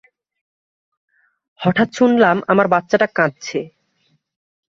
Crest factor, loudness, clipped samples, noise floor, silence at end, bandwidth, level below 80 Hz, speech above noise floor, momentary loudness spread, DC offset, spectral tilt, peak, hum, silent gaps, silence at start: 18 dB; -16 LUFS; under 0.1%; -64 dBFS; 1.1 s; 7.6 kHz; -62 dBFS; 48 dB; 12 LU; under 0.1%; -6 dB/octave; -2 dBFS; none; none; 1.6 s